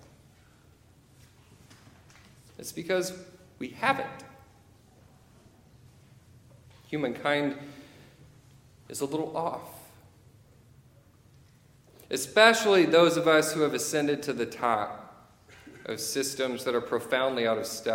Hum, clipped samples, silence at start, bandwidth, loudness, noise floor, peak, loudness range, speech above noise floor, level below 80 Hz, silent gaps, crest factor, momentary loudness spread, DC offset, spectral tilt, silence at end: none; under 0.1%; 2.6 s; 17 kHz; -27 LUFS; -58 dBFS; -4 dBFS; 14 LU; 32 dB; -68 dBFS; none; 28 dB; 21 LU; under 0.1%; -3.5 dB/octave; 0 s